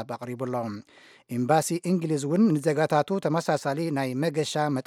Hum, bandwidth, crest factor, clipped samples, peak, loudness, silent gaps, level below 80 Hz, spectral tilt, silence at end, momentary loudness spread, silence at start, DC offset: none; 16 kHz; 18 dB; under 0.1%; -8 dBFS; -26 LUFS; none; -74 dBFS; -6 dB/octave; 0.05 s; 10 LU; 0 s; under 0.1%